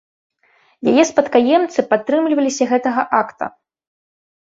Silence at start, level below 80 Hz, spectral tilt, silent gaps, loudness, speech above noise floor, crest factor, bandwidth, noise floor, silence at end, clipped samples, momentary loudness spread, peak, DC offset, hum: 0.8 s; -62 dBFS; -4 dB/octave; none; -16 LUFS; 42 dB; 18 dB; 7.8 kHz; -57 dBFS; 1 s; under 0.1%; 9 LU; 0 dBFS; under 0.1%; none